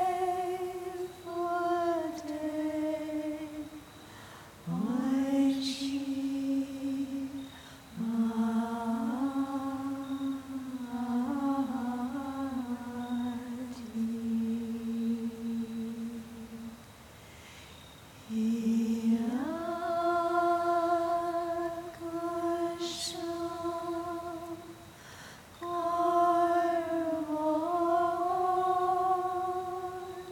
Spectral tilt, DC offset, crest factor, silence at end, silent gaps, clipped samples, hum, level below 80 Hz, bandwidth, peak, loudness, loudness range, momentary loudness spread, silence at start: -5.5 dB/octave; under 0.1%; 16 dB; 0 s; none; under 0.1%; none; -66 dBFS; 18 kHz; -16 dBFS; -32 LUFS; 6 LU; 17 LU; 0 s